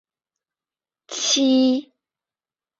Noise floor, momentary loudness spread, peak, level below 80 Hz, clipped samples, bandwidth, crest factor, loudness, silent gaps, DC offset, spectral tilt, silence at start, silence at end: under -90 dBFS; 11 LU; -8 dBFS; -70 dBFS; under 0.1%; 7.8 kHz; 16 dB; -19 LUFS; none; under 0.1%; -1 dB/octave; 1.1 s; 0.95 s